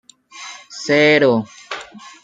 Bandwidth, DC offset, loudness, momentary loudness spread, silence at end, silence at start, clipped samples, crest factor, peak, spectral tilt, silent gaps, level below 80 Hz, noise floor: 9.2 kHz; under 0.1%; -14 LUFS; 22 LU; 0.15 s; 0.35 s; under 0.1%; 16 dB; -2 dBFS; -4.5 dB/octave; none; -64 dBFS; -37 dBFS